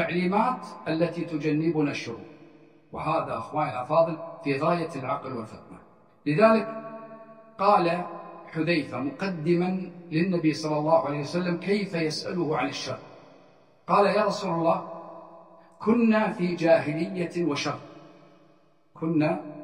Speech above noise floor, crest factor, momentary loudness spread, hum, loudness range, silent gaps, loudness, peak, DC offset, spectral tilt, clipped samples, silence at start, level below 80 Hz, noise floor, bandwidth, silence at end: 36 dB; 20 dB; 17 LU; none; 3 LU; none; -26 LUFS; -8 dBFS; under 0.1%; -6.5 dB/octave; under 0.1%; 0 s; -68 dBFS; -62 dBFS; 11 kHz; 0 s